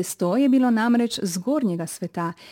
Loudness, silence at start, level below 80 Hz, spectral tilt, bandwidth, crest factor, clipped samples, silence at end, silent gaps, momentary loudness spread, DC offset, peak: -22 LUFS; 0 s; -70 dBFS; -5 dB/octave; 17 kHz; 12 dB; under 0.1%; 0 s; none; 10 LU; under 0.1%; -10 dBFS